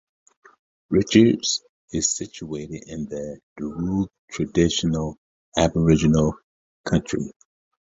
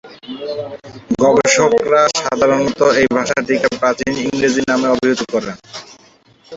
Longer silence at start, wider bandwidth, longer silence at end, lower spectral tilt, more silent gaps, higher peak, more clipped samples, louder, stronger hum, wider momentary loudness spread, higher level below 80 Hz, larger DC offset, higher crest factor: first, 0.9 s vs 0.05 s; about the same, 8 kHz vs 8 kHz; first, 0.65 s vs 0 s; first, -5 dB/octave vs -3.5 dB/octave; first, 1.69-1.88 s, 3.43-3.56 s, 4.19-4.28 s, 5.18-5.52 s, 6.43-6.84 s vs none; about the same, -2 dBFS vs 0 dBFS; neither; second, -23 LUFS vs -15 LUFS; neither; about the same, 15 LU vs 16 LU; first, -42 dBFS vs -50 dBFS; neither; first, 22 dB vs 14 dB